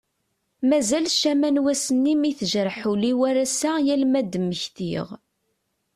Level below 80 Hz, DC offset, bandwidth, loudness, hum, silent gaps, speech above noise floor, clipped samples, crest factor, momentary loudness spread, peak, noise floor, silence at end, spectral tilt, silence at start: -64 dBFS; under 0.1%; 13.5 kHz; -22 LUFS; none; none; 52 dB; under 0.1%; 14 dB; 8 LU; -10 dBFS; -74 dBFS; 0.8 s; -4 dB/octave; 0.6 s